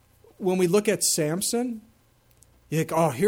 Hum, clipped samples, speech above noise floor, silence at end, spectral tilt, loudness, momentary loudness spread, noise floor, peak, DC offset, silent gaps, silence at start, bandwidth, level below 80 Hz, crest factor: none; under 0.1%; 37 dB; 0 s; -4 dB/octave; -24 LUFS; 9 LU; -61 dBFS; -10 dBFS; under 0.1%; none; 0.4 s; 18 kHz; -64 dBFS; 16 dB